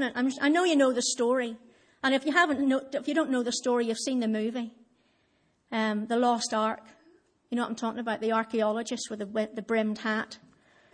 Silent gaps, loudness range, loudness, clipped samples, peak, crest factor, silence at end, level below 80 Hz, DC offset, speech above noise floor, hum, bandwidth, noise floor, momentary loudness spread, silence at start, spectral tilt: none; 5 LU; -28 LUFS; under 0.1%; -10 dBFS; 18 dB; 0.55 s; -76 dBFS; under 0.1%; 42 dB; none; 10.5 kHz; -70 dBFS; 11 LU; 0 s; -3.5 dB/octave